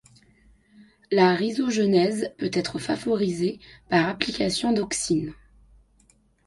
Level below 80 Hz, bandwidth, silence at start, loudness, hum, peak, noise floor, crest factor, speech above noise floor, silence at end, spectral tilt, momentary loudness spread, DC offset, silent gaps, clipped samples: -56 dBFS; 11.5 kHz; 1.1 s; -24 LUFS; none; -4 dBFS; -61 dBFS; 22 dB; 38 dB; 1.15 s; -4.5 dB/octave; 8 LU; under 0.1%; none; under 0.1%